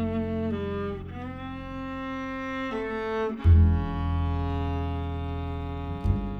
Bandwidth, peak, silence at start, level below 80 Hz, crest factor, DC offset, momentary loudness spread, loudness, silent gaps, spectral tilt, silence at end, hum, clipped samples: 4.9 kHz; -10 dBFS; 0 s; -32 dBFS; 16 dB; under 0.1%; 15 LU; -29 LUFS; none; -9 dB/octave; 0 s; none; under 0.1%